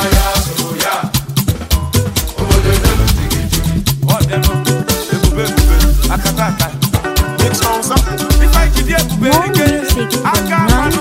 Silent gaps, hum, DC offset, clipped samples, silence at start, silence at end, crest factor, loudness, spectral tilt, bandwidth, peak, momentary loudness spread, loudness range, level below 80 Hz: none; none; under 0.1%; under 0.1%; 0 s; 0 s; 12 dB; -13 LUFS; -4.5 dB/octave; 16.5 kHz; 0 dBFS; 4 LU; 2 LU; -16 dBFS